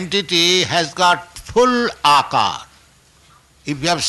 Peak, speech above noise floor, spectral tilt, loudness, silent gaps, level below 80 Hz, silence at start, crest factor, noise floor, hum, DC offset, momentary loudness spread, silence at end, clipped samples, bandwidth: -4 dBFS; 35 dB; -2.5 dB/octave; -16 LUFS; none; -48 dBFS; 0 s; 14 dB; -51 dBFS; none; under 0.1%; 9 LU; 0 s; under 0.1%; 12.5 kHz